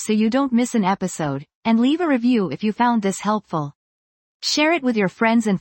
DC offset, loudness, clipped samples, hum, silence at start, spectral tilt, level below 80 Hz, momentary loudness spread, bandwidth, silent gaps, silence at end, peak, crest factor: under 0.1%; -20 LUFS; under 0.1%; none; 0 s; -5 dB/octave; -62 dBFS; 8 LU; 17 kHz; 1.55-1.63 s, 3.75-4.40 s; 0 s; -6 dBFS; 14 dB